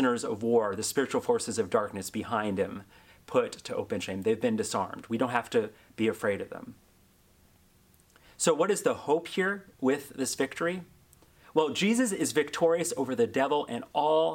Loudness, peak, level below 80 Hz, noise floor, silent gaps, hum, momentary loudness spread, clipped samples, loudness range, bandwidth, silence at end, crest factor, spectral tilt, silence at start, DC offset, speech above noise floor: -29 LUFS; -10 dBFS; -68 dBFS; -62 dBFS; none; none; 8 LU; under 0.1%; 4 LU; 16.5 kHz; 0 s; 20 dB; -4 dB/octave; 0 s; under 0.1%; 33 dB